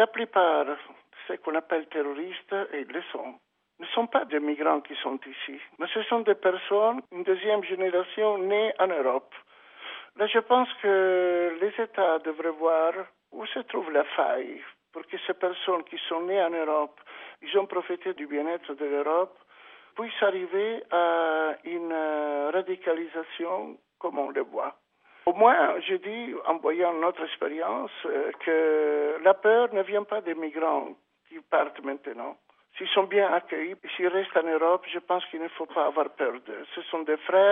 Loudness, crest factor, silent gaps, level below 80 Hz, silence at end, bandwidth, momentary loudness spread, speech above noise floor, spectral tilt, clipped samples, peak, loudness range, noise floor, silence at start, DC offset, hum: -27 LUFS; 22 dB; none; -84 dBFS; 0 s; 3.8 kHz; 14 LU; 26 dB; -0.5 dB/octave; under 0.1%; -6 dBFS; 5 LU; -53 dBFS; 0 s; under 0.1%; none